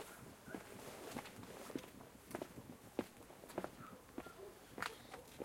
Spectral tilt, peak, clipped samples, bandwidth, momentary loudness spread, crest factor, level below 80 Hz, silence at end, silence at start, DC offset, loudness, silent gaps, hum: -4 dB/octave; -24 dBFS; under 0.1%; 16.5 kHz; 9 LU; 28 dB; -72 dBFS; 0 s; 0 s; under 0.1%; -52 LUFS; none; none